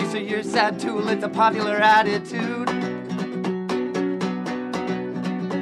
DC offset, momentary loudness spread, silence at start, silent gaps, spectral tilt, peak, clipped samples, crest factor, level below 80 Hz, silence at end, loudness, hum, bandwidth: under 0.1%; 10 LU; 0 s; none; -5.5 dB/octave; -4 dBFS; under 0.1%; 18 dB; -66 dBFS; 0 s; -23 LUFS; none; 12.5 kHz